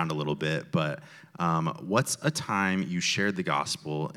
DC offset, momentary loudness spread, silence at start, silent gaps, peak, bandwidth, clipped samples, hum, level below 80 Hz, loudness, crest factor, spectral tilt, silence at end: under 0.1%; 5 LU; 0 s; none; -10 dBFS; 15.5 kHz; under 0.1%; none; -68 dBFS; -28 LUFS; 20 dB; -4.5 dB/octave; 0 s